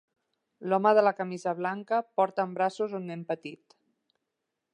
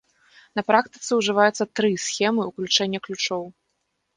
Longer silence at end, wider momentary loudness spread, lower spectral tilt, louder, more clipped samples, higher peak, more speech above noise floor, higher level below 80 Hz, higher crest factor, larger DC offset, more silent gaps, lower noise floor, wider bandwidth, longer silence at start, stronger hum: first, 1.2 s vs 0.65 s; first, 13 LU vs 9 LU; first, -6.5 dB/octave vs -3 dB/octave; second, -28 LUFS vs -22 LUFS; neither; second, -10 dBFS vs -2 dBFS; first, 56 dB vs 52 dB; second, -86 dBFS vs -68 dBFS; about the same, 20 dB vs 22 dB; neither; neither; first, -84 dBFS vs -75 dBFS; about the same, 9.8 kHz vs 10 kHz; about the same, 0.6 s vs 0.55 s; neither